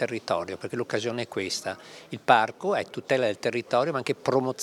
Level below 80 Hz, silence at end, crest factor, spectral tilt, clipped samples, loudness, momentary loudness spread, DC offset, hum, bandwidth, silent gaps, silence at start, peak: -72 dBFS; 0 s; 24 dB; -4.5 dB/octave; under 0.1%; -27 LUFS; 11 LU; under 0.1%; none; 15.5 kHz; none; 0 s; -4 dBFS